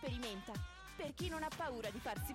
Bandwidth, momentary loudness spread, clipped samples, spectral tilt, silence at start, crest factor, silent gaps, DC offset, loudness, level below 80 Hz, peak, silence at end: 16 kHz; 6 LU; under 0.1%; -4.5 dB/octave; 0 s; 14 dB; none; under 0.1%; -45 LUFS; -56 dBFS; -30 dBFS; 0 s